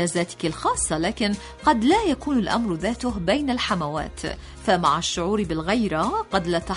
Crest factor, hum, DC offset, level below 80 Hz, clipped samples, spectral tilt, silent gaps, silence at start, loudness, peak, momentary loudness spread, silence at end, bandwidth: 18 dB; none; under 0.1%; -42 dBFS; under 0.1%; -4.5 dB/octave; none; 0 s; -23 LUFS; -6 dBFS; 7 LU; 0 s; 11 kHz